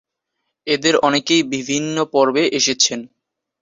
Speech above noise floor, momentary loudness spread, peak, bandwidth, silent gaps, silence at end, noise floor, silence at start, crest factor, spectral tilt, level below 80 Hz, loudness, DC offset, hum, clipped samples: 59 dB; 6 LU; -2 dBFS; 8 kHz; none; 0.55 s; -76 dBFS; 0.65 s; 18 dB; -2.5 dB/octave; -62 dBFS; -17 LUFS; under 0.1%; none; under 0.1%